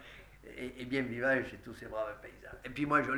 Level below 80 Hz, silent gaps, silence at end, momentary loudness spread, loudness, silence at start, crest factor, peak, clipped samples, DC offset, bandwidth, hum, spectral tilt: -60 dBFS; none; 0 s; 19 LU; -36 LUFS; 0 s; 22 dB; -14 dBFS; under 0.1%; under 0.1%; over 20 kHz; none; -6 dB/octave